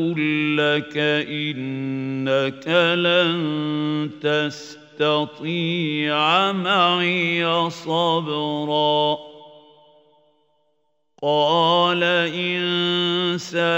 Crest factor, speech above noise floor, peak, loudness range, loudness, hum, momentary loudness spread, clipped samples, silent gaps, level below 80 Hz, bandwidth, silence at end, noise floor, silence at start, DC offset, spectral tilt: 18 dB; 50 dB; -4 dBFS; 4 LU; -20 LUFS; none; 8 LU; under 0.1%; none; -72 dBFS; 16 kHz; 0 s; -71 dBFS; 0 s; under 0.1%; -5.5 dB/octave